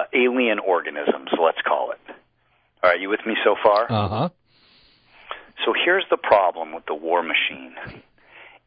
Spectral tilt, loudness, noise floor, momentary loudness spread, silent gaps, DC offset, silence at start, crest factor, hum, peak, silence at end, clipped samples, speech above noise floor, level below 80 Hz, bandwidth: -9.5 dB/octave; -21 LUFS; -65 dBFS; 18 LU; none; under 0.1%; 0 s; 20 dB; none; -4 dBFS; 0.2 s; under 0.1%; 44 dB; -56 dBFS; 5.2 kHz